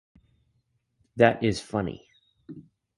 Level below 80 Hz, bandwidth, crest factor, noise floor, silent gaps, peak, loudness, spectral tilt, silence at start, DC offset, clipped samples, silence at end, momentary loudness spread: -56 dBFS; 11.5 kHz; 24 dB; -73 dBFS; none; -4 dBFS; -25 LUFS; -6 dB/octave; 1.15 s; under 0.1%; under 0.1%; 0.35 s; 25 LU